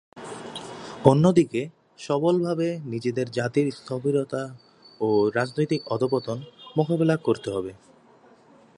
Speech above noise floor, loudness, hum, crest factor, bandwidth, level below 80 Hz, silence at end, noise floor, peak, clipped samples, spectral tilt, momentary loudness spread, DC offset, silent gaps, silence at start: 31 dB; -24 LUFS; none; 24 dB; 11.5 kHz; -62 dBFS; 1.05 s; -55 dBFS; 0 dBFS; under 0.1%; -7 dB/octave; 17 LU; under 0.1%; none; 0.15 s